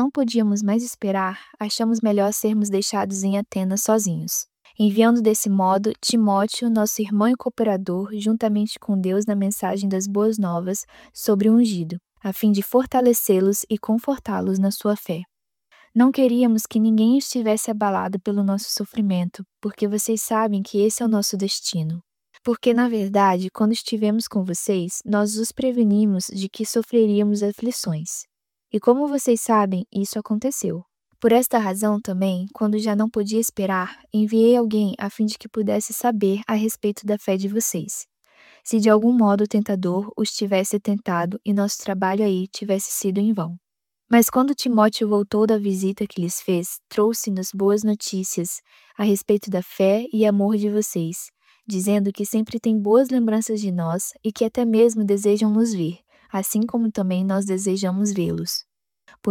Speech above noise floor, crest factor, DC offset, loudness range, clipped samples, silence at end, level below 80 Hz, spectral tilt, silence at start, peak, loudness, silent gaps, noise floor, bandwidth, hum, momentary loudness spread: 39 dB; 18 dB; under 0.1%; 3 LU; under 0.1%; 0 s; -64 dBFS; -5 dB/octave; 0 s; -4 dBFS; -21 LUFS; none; -60 dBFS; 18 kHz; none; 9 LU